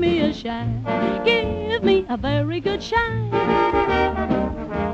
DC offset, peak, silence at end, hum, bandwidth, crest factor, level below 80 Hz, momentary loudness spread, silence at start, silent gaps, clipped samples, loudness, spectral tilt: under 0.1%; -4 dBFS; 0 s; none; 8 kHz; 16 dB; -36 dBFS; 6 LU; 0 s; none; under 0.1%; -21 LUFS; -7 dB/octave